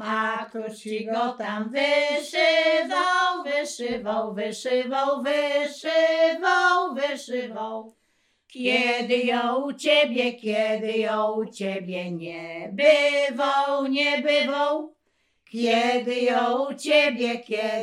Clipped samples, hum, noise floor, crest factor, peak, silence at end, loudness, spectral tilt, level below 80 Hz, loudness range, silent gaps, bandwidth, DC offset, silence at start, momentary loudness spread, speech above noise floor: under 0.1%; none; -70 dBFS; 18 dB; -6 dBFS; 0 s; -23 LUFS; -3.5 dB/octave; -74 dBFS; 2 LU; none; 13.5 kHz; under 0.1%; 0 s; 11 LU; 47 dB